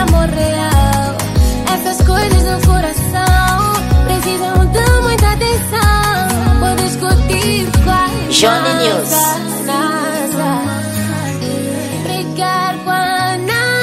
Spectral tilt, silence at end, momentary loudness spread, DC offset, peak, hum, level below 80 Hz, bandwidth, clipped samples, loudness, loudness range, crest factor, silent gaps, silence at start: -4.5 dB/octave; 0 s; 7 LU; under 0.1%; 0 dBFS; none; -18 dBFS; 16 kHz; under 0.1%; -13 LUFS; 4 LU; 12 dB; none; 0 s